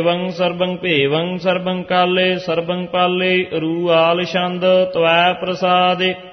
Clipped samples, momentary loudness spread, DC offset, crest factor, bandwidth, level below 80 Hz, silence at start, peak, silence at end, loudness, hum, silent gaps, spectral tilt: under 0.1%; 6 LU; under 0.1%; 14 dB; 6.4 kHz; -58 dBFS; 0 s; -2 dBFS; 0 s; -16 LUFS; none; none; -6.5 dB/octave